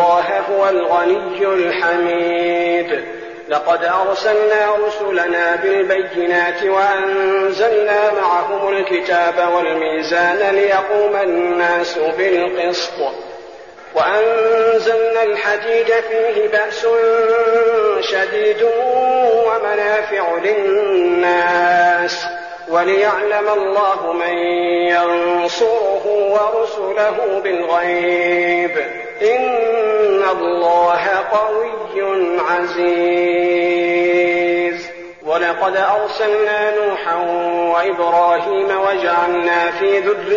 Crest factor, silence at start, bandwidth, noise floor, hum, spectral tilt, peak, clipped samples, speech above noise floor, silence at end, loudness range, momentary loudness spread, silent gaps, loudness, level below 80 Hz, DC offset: 12 dB; 0 s; 7.2 kHz; -36 dBFS; none; -1 dB/octave; -4 dBFS; under 0.1%; 21 dB; 0 s; 2 LU; 5 LU; none; -15 LUFS; -60 dBFS; 0.2%